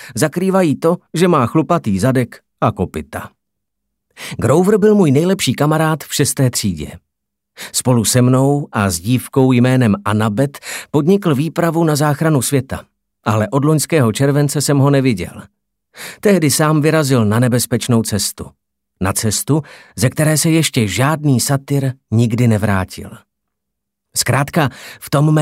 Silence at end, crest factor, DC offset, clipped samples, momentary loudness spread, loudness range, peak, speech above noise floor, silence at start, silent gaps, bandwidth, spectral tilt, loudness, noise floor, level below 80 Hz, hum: 0 s; 16 dB; under 0.1%; under 0.1%; 11 LU; 3 LU; 0 dBFS; 64 dB; 0 s; none; 16.5 kHz; -5.5 dB/octave; -15 LUFS; -78 dBFS; -48 dBFS; none